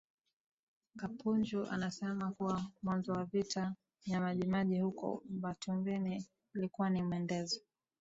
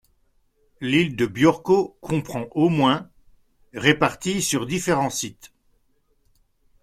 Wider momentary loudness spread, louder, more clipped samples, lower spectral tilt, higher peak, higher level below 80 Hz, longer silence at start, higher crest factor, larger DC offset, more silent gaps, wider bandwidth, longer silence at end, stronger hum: second, 7 LU vs 10 LU; second, -38 LUFS vs -22 LUFS; neither; first, -6 dB/octave vs -4.5 dB/octave; second, -22 dBFS vs -2 dBFS; second, -72 dBFS vs -56 dBFS; first, 0.95 s vs 0.8 s; second, 16 dB vs 22 dB; neither; neither; second, 7.8 kHz vs 15 kHz; second, 0.4 s vs 1.35 s; neither